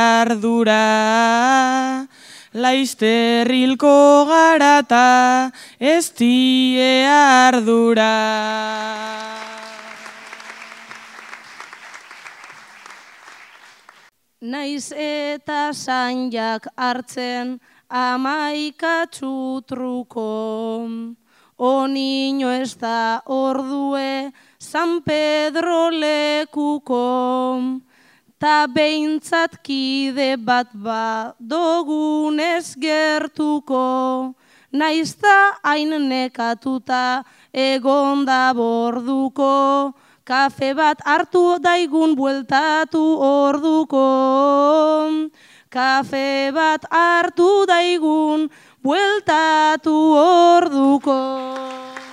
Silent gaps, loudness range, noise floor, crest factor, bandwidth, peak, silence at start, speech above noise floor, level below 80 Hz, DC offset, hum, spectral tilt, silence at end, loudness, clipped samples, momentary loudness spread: none; 11 LU; -54 dBFS; 18 dB; 13.5 kHz; 0 dBFS; 0 s; 37 dB; -70 dBFS; under 0.1%; none; -3 dB/octave; 0 s; -17 LUFS; under 0.1%; 16 LU